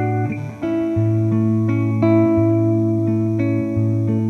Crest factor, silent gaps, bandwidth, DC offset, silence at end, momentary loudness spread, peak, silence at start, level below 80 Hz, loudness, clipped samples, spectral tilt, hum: 12 dB; none; 6.2 kHz; under 0.1%; 0 s; 7 LU; -4 dBFS; 0 s; -48 dBFS; -18 LUFS; under 0.1%; -10.5 dB/octave; none